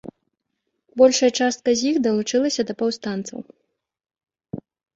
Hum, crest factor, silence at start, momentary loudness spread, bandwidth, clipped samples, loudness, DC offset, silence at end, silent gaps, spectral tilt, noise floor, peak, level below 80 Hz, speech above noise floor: none; 20 dB; 0.05 s; 21 LU; 8 kHz; under 0.1%; -20 LUFS; under 0.1%; 0.35 s; none; -3.5 dB/octave; -77 dBFS; -2 dBFS; -64 dBFS; 57 dB